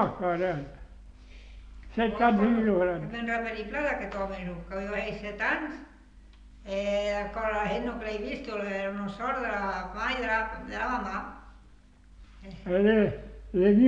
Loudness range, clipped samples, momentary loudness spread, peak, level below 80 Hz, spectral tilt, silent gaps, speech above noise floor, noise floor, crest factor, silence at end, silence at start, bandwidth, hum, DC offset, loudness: 5 LU; under 0.1%; 16 LU; -10 dBFS; -48 dBFS; -7 dB/octave; none; 26 dB; -54 dBFS; 18 dB; 0 s; 0 s; 7.8 kHz; none; under 0.1%; -29 LUFS